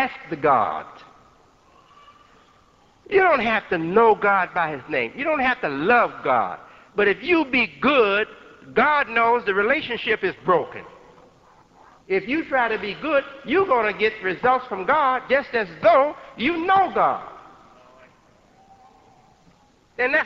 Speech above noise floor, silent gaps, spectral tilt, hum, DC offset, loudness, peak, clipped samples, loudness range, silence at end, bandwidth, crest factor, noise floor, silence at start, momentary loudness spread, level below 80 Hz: 36 dB; none; -6.5 dB/octave; none; under 0.1%; -21 LUFS; -6 dBFS; under 0.1%; 5 LU; 0 s; 7.4 kHz; 18 dB; -56 dBFS; 0 s; 8 LU; -58 dBFS